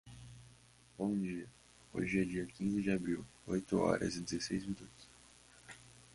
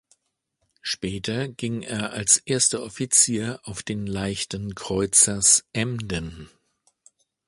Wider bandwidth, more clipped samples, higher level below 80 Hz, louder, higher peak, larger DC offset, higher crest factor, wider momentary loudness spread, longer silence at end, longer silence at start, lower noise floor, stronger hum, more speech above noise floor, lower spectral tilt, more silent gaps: about the same, 11.5 kHz vs 12 kHz; neither; second, -62 dBFS vs -50 dBFS; second, -38 LUFS vs -22 LUFS; second, -18 dBFS vs -2 dBFS; neither; about the same, 20 dB vs 22 dB; first, 22 LU vs 14 LU; second, 0.15 s vs 1 s; second, 0.05 s vs 0.85 s; second, -64 dBFS vs -75 dBFS; neither; second, 27 dB vs 51 dB; first, -5.5 dB/octave vs -2.5 dB/octave; neither